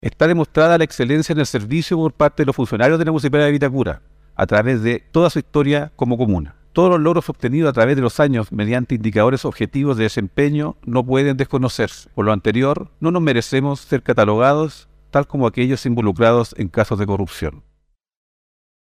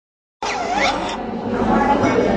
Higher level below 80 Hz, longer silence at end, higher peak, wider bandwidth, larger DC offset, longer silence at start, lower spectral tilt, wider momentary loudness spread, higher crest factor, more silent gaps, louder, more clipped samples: about the same, -44 dBFS vs -40 dBFS; first, 1.35 s vs 0 s; about the same, -2 dBFS vs -4 dBFS; first, 15 kHz vs 10.5 kHz; neither; second, 0.05 s vs 0.4 s; first, -7 dB/octave vs -5 dB/octave; about the same, 7 LU vs 9 LU; about the same, 16 dB vs 16 dB; neither; about the same, -17 LUFS vs -19 LUFS; neither